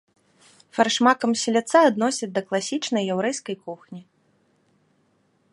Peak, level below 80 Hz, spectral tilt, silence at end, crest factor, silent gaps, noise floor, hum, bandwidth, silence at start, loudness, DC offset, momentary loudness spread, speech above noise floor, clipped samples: -4 dBFS; -76 dBFS; -3.5 dB/octave; 1.5 s; 20 dB; none; -65 dBFS; none; 11.5 kHz; 0.75 s; -22 LUFS; under 0.1%; 18 LU; 43 dB; under 0.1%